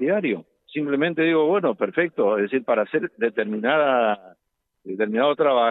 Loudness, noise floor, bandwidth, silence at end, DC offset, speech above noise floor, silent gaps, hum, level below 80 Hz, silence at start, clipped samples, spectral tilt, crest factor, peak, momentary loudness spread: -22 LUFS; -75 dBFS; 4.1 kHz; 0 s; under 0.1%; 54 dB; none; none; -78 dBFS; 0 s; under 0.1%; -9 dB/octave; 14 dB; -8 dBFS; 8 LU